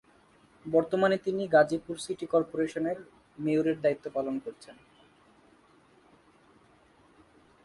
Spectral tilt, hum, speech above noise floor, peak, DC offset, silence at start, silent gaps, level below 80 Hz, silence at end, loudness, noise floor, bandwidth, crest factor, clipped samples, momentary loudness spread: -6 dB/octave; none; 33 dB; -10 dBFS; under 0.1%; 0.65 s; none; -70 dBFS; 2.95 s; -29 LUFS; -61 dBFS; 11.5 kHz; 20 dB; under 0.1%; 13 LU